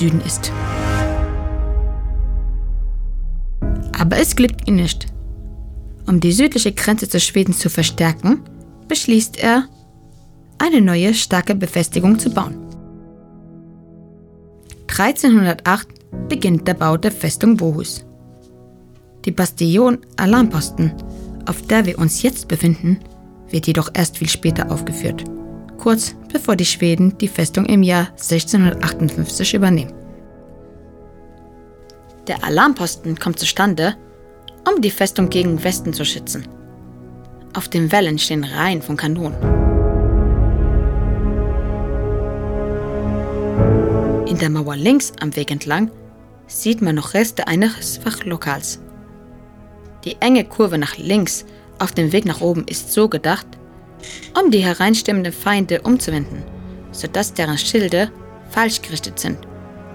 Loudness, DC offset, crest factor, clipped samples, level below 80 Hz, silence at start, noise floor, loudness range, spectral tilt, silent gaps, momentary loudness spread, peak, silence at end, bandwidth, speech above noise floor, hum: -17 LUFS; under 0.1%; 18 dB; under 0.1%; -28 dBFS; 0 s; -44 dBFS; 4 LU; -5 dB/octave; none; 13 LU; 0 dBFS; 0 s; 19 kHz; 28 dB; none